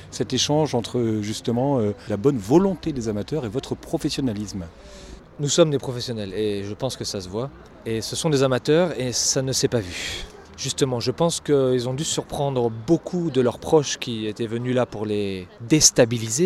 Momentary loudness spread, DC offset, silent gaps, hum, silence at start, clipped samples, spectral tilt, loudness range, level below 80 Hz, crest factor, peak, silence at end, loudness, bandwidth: 11 LU; under 0.1%; none; none; 0 s; under 0.1%; -4.5 dB/octave; 3 LU; -48 dBFS; 22 dB; 0 dBFS; 0 s; -22 LUFS; 16 kHz